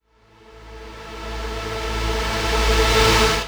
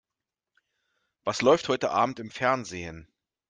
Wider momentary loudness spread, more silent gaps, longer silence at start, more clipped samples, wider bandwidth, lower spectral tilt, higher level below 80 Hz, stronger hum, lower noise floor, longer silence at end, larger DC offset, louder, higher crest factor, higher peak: first, 21 LU vs 14 LU; neither; second, 0.5 s vs 1.25 s; neither; first, over 20 kHz vs 9.6 kHz; about the same, -3.5 dB/octave vs -4.5 dB/octave; first, -26 dBFS vs -64 dBFS; neither; second, -51 dBFS vs -89 dBFS; second, 0 s vs 0.45 s; neither; first, -19 LUFS vs -26 LUFS; about the same, 18 dB vs 22 dB; first, -2 dBFS vs -8 dBFS